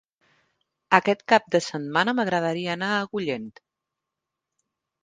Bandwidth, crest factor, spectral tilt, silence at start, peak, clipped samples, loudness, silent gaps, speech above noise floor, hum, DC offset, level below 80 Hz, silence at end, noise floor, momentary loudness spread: 9.8 kHz; 26 dB; -5 dB/octave; 0.9 s; 0 dBFS; under 0.1%; -23 LUFS; none; 62 dB; none; under 0.1%; -72 dBFS; 1.55 s; -85 dBFS; 9 LU